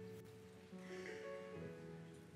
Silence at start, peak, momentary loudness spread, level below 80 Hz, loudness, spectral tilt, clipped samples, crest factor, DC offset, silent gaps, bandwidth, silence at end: 0 s; -38 dBFS; 8 LU; -80 dBFS; -53 LUFS; -6 dB/octave; under 0.1%; 14 dB; under 0.1%; none; 16 kHz; 0 s